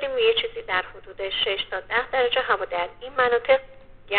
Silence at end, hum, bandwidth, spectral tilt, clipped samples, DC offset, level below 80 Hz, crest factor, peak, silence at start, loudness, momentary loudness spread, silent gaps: 0 s; none; 4.6 kHz; 1.5 dB/octave; under 0.1%; 0.2%; -50 dBFS; 18 dB; -6 dBFS; 0 s; -24 LUFS; 8 LU; none